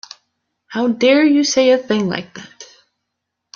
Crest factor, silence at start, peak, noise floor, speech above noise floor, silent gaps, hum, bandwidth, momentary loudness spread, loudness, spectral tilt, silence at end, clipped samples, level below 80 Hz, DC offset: 16 dB; 0.7 s; -2 dBFS; -77 dBFS; 62 dB; none; none; 7.2 kHz; 16 LU; -15 LUFS; -4 dB/octave; 0.9 s; under 0.1%; -62 dBFS; under 0.1%